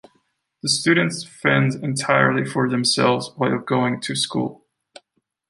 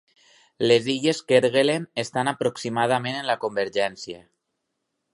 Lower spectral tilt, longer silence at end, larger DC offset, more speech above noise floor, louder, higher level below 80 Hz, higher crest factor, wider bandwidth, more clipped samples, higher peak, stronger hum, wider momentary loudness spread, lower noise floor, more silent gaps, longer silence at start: about the same, -4.5 dB/octave vs -4.5 dB/octave; about the same, 0.95 s vs 0.95 s; neither; second, 50 dB vs 56 dB; first, -20 LUFS vs -23 LUFS; about the same, -64 dBFS vs -68 dBFS; about the same, 20 dB vs 20 dB; about the same, 11.5 kHz vs 11.5 kHz; neither; about the same, -2 dBFS vs -4 dBFS; neither; about the same, 7 LU vs 8 LU; second, -70 dBFS vs -78 dBFS; neither; about the same, 0.65 s vs 0.6 s